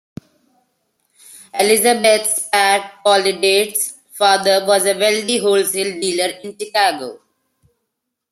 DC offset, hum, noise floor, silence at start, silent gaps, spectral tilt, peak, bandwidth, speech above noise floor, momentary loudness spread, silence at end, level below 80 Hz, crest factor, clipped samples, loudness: under 0.1%; none; -76 dBFS; 1.35 s; none; -1.5 dB/octave; 0 dBFS; 16 kHz; 61 dB; 9 LU; 1.15 s; -66 dBFS; 18 dB; under 0.1%; -15 LUFS